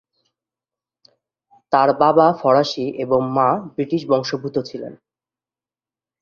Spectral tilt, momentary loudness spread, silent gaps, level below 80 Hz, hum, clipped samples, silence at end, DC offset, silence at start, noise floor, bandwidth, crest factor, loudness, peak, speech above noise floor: -6.5 dB/octave; 11 LU; none; -62 dBFS; none; under 0.1%; 1.3 s; under 0.1%; 1.7 s; under -90 dBFS; 7 kHz; 18 dB; -18 LUFS; -2 dBFS; over 72 dB